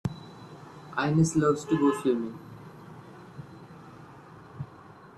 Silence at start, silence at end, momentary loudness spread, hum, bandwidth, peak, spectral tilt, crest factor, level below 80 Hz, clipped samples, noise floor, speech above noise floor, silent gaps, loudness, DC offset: 0.05 s; 0.1 s; 24 LU; none; 12.5 kHz; -12 dBFS; -6.5 dB/octave; 18 dB; -62 dBFS; under 0.1%; -50 dBFS; 25 dB; none; -27 LUFS; under 0.1%